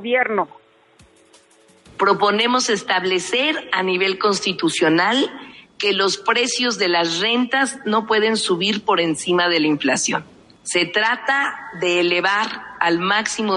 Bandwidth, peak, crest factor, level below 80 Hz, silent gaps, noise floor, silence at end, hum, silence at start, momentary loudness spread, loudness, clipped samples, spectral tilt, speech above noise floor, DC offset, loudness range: 11.5 kHz; -2 dBFS; 18 dB; -66 dBFS; none; -53 dBFS; 0 s; none; 0 s; 6 LU; -18 LUFS; under 0.1%; -2.5 dB/octave; 34 dB; under 0.1%; 2 LU